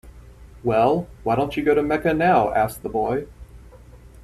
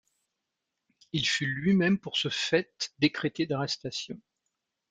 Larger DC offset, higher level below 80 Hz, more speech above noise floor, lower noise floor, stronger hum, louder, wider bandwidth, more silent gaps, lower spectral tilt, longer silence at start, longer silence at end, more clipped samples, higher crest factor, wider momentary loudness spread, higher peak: neither; first, -44 dBFS vs -66 dBFS; second, 25 dB vs 56 dB; second, -45 dBFS vs -85 dBFS; neither; first, -21 LUFS vs -28 LUFS; first, 14 kHz vs 9.2 kHz; neither; first, -7 dB/octave vs -4.5 dB/octave; second, 0.05 s vs 1.15 s; second, 0.25 s vs 0.75 s; neither; about the same, 18 dB vs 20 dB; second, 8 LU vs 11 LU; first, -4 dBFS vs -10 dBFS